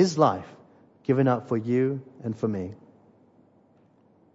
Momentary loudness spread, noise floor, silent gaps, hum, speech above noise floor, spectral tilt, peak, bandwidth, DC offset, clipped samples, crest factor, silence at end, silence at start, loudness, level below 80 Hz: 13 LU; -60 dBFS; none; none; 36 dB; -7 dB/octave; -6 dBFS; 8 kHz; under 0.1%; under 0.1%; 20 dB; 1.6 s; 0 s; -26 LUFS; -70 dBFS